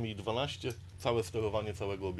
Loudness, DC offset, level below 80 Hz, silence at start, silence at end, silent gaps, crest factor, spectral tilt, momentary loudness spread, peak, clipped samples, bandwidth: -36 LUFS; under 0.1%; -56 dBFS; 0 s; 0 s; none; 20 dB; -5.5 dB/octave; 5 LU; -16 dBFS; under 0.1%; 13.5 kHz